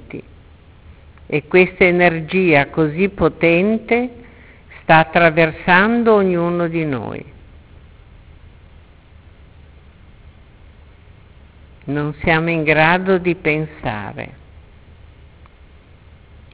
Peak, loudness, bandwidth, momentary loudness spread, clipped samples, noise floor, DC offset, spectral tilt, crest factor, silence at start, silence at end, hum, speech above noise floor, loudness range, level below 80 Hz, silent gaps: 0 dBFS; -15 LUFS; 4 kHz; 16 LU; under 0.1%; -45 dBFS; under 0.1%; -10 dB/octave; 18 dB; 0.15 s; 2.25 s; none; 29 dB; 11 LU; -44 dBFS; none